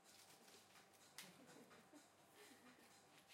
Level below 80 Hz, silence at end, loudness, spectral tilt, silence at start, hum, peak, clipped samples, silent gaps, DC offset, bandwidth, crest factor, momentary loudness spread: under -90 dBFS; 0 s; -65 LUFS; -2 dB/octave; 0 s; none; -40 dBFS; under 0.1%; none; under 0.1%; 16 kHz; 26 dB; 7 LU